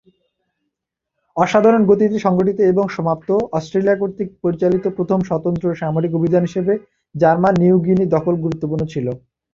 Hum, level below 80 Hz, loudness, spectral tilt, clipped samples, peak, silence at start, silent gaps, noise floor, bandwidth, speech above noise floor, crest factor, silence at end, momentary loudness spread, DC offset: none; -52 dBFS; -17 LUFS; -8.5 dB/octave; under 0.1%; -2 dBFS; 1.35 s; none; -80 dBFS; 7.4 kHz; 64 dB; 16 dB; 0.35 s; 9 LU; under 0.1%